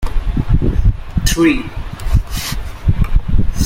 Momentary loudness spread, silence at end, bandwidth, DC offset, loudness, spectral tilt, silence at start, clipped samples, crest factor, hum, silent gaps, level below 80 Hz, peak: 8 LU; 0 s; 16.5 kHz; under 0.1%; -18 LUFS; -5.5 dB/octave; 0 s; under 0.1%; 12 dB; none; none; -16 dBFS; 0 dBFS